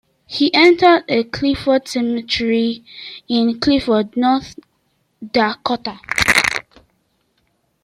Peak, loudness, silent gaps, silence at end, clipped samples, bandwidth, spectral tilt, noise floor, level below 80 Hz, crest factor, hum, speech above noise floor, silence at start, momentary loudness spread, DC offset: 0 dBFS; -16 LUFS; none; 1.25 s; under 0.1%; 16.5 kHz; -3.5 dB/octave; -65 dBFS; -46 dBFS; 18 dB; none; 49 dB; 0.3 s; 12 LU; under 0.1%